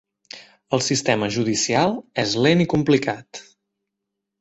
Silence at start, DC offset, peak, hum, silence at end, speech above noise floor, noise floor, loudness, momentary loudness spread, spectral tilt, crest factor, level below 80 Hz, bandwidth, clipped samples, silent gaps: 0.35 s; under 0.1%; -4 dBFS; none; 1 s; 61 dB; -81 dBFS; -20 LUFS; 22 LU; -4.5 dB/octave; 18 dB; -56 dBFS; 8.2 kHz; under 0.1%; none